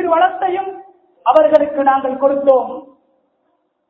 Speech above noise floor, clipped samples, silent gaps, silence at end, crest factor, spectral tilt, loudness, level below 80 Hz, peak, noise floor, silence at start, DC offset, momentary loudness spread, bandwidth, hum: 51 dB; 0.1%; none; 1.05 s; 16 dB; -6.5 dB/octave; -14 LUFS; -60 dBFS; 0 dBFS; -65 dBFS; 0 s; under 0.1%; 14 LU; 4.9 kHz; none